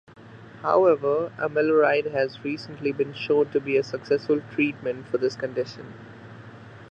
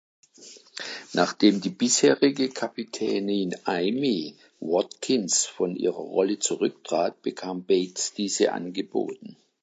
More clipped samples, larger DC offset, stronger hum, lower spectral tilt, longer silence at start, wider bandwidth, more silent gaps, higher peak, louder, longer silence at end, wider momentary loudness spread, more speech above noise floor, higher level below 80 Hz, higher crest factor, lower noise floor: neither; neither; neither; first, -6.5 dB/octave vs -3.5 dB/octave; second, 0.2 s vs 0.4 s; second, 7.6 kHz vs 9.4 kHz; neither; about the same, -6 dBFS vs -6 dBFS; about the same, -24 LUFS vs -25 LUFS; second, 0 s vs 0.3 s; first, 23 LU vs 13 LU; second, 20 dB vs 25 dB; first, -66 dBFS vs -78 dBFS; about the same, 18 dB vs 20 dB; second, -44 dBFS vs -50 dBFS